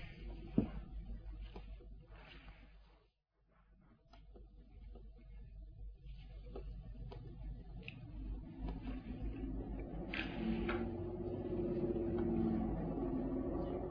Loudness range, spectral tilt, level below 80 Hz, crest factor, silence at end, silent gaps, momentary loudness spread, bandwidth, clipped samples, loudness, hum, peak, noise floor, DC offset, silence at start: 21 LU; -7 dB/octave; -50 dBFS; 24 dB; 0 s; none; 19 LU; 5.2 kHz; under 0.1%; -43 LUFS; none; -20 dBFS; -77 dBFS; under 0.1%; 0 s